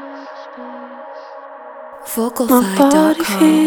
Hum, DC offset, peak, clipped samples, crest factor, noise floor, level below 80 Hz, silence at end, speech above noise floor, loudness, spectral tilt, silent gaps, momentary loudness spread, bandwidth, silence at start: none; under 0.1%; 0 dBFS; under 0.1%; 16 dB; -34 dBFS; -56 dBFS; 0 s; 21 dB; -14 LUFS; -4.5 dB/octave; none; 22 LU; 20 kHz; 0 s